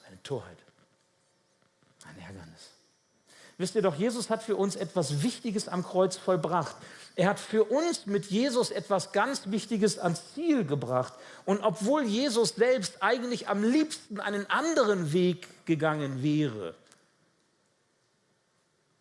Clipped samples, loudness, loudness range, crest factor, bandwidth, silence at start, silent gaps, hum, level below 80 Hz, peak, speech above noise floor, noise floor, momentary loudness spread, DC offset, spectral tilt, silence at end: under 0.1%; -29 LUFS; 6 LU; 20 dB; 12 kHz; 0.1 s; none; none; -76 dBFS; -10 dBFS; 43 dB; -72 dBFS; 12 LU; under 0.1%; -5 dB/octave; 2.3 s